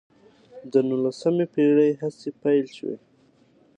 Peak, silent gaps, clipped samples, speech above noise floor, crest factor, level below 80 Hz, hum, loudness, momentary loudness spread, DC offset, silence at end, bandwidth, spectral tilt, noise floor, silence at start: -6 dBFS; none; under 0.1%; 37 dB; 18 dB; -74 dBFS; none; -23 LUFS; 14 LU; under 0.1%; 0.8 s; 9.2 kHz; -7.5 dB/octave; -59 dBFS; 0.55 s